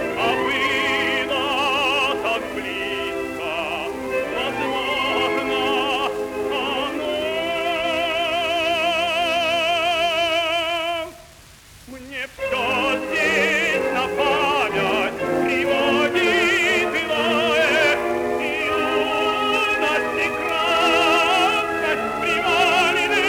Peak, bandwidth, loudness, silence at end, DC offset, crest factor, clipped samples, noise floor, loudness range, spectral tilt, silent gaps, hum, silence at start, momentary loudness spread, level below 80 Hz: -6 dBFS; over 20 kHz; -20 LUFS; 0 s; under 0.1%; 16 dB; under 0.1%; -46 dBFS; 4 LU; -3 dB/octave; none; none; 0 s; 8 LU; -50 dBFS